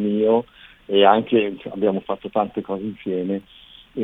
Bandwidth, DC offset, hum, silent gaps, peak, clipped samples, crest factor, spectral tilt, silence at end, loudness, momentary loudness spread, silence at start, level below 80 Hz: 4 kHz; under 0.1%; none; none; 0 dBFS; under 0.1%; 20 dB; -8.5 dB/octave; 0 s; -21 LUFS; 13 LU; 0 s; -58 dBFS